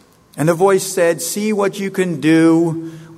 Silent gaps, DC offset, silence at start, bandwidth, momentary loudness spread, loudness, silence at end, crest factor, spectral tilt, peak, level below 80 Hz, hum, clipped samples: none; under 0.1%; 0.35 s; 15.5 kHz; 8 LU; -16 LUFS; 0 s; 14 dB; -5.5 dB/octave; -2 dBFS; -62 dBFS; none; under 0.1%